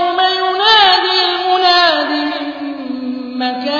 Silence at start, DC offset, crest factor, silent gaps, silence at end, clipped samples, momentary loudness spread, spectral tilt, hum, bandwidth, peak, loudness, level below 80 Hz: 0 s; under 0.1%; 14 dB; none; 0 s; under 0.1%; 15 LU; -2 dB/octave; none; 5.4 kHz; 0 dBFS; -12 LUFS; -56 dBFS